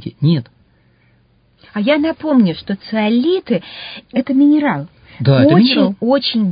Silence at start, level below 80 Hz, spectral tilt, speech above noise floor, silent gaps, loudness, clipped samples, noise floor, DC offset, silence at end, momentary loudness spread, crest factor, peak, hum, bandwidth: 0.05 s; -54 dBFS; -11.5 dB/octave; 40 dB; none; -15 LUFS; under 0.1%; -54 dBFS; under 0.1%; 0 s; 13 LU; 16 dB; 0 dBFS; none; 5.2 kHz